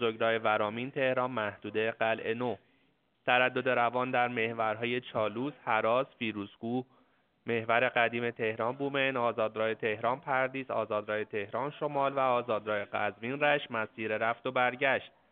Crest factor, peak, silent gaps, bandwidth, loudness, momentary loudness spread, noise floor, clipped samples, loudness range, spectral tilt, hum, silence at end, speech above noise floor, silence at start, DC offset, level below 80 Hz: 20 dB; -10 dBFS; none; 4.5 kHz; -31 LUFS; 8 LU; -72 dBFS; under 0.1%; 2 LU; -2.5 dB/octave; none; 0.25 s; 41 dB; 0 s; under 0.1%; -78 dBFS